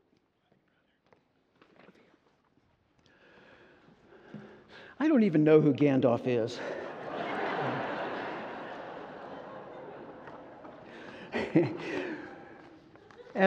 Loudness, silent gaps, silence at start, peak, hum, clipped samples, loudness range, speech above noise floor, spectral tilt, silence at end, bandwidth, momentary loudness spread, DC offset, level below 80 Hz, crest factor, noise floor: -30 LUFS; none; 4.3 s; -8 dBFS; none; under 0.1%; 13 LU; 47 dB; -8 dB/octave; 0 s; 7.8 kHz; 25 LU; under 0.1%; -72 dBFS; 24 dB; -72 dBFS